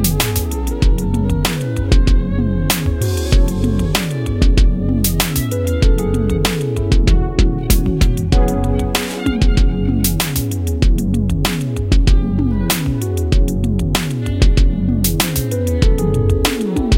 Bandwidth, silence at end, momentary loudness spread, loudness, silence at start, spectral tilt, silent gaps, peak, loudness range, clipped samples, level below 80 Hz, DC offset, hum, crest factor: 17 kHz; 0 s; 4 LU; -17 LUFS; 0 s; -5.5 dB/octave; none; 0 dBFS; 1 LU; under 0.1%; -16 dBFS; under 0.1%; none; 14 dB